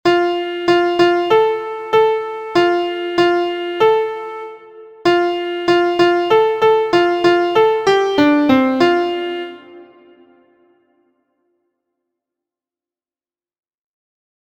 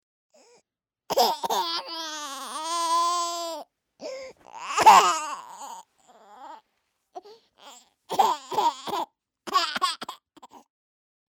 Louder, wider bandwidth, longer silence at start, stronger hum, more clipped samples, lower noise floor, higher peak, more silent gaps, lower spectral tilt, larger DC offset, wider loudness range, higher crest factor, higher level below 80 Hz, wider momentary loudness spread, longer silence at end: first, -15 LUFS vs -24 LUFS; second, 8.8 kHz vs 18 kHz; second, 0.05 s vs 1.1 s; neither; neither; first, under -90 dBFS vs -78 dBFS; first, 0 dBFS vs -6 dBFS; neither; first, -5 dB/octave vs -1 dB/octave; neither; about the same, 6 LU vs 8 LU; second, 16 dB vs 22 dB; first, -56 dBFS vs -76 dBFS; second, 9 LU vs 25 LU; first, 4.6 s vs 0.7 s